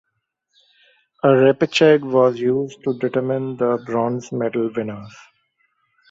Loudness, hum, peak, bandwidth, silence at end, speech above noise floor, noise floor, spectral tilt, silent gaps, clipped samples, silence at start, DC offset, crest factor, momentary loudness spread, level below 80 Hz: -19 LUFS; none; -2 dBFS; 7.8 kHz; 1 s; 56 dB; -74 dBFS; -6.5 dB/octave; none; under 0.1%; 1.25 s; under 0.1%; 18 dB; 10 LU; -64 dBFS